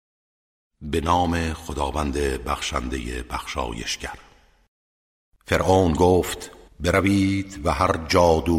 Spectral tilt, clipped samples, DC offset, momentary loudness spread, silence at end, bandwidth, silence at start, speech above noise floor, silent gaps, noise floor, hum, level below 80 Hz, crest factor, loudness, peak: -5.5 dB/octave; under 0.1%; under 0.1%; 12 LU; 0 s; 16 kHz; 0.8 s; over 68 dB; 4.68-5.32 s; under -90 dBFS; none; -36 dBFS; 18 dB; -23 LUFS; -6 dBFS